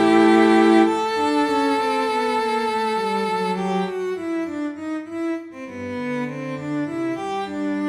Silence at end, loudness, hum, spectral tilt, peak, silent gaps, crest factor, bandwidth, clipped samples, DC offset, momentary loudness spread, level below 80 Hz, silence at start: 0 s; -21 LUFS; none; -5.5 dB/octave; -4 dBFS; none; 16 dB; 12 kHz; under 0.1%; under 0.1%; 14 LU; -62 dBFS; 0 s